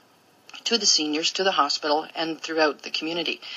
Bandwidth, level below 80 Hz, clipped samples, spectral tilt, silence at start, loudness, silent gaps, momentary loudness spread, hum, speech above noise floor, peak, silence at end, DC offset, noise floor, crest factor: 14 kHz; -90 dBFS; under 0.1%; -1 dB/octave; 0.55 s; -23 LUFS; none; 10 LU; none; 30 dB; -6 dBFS; 0 s; under 0.1%; -55 dBFS; 20 dB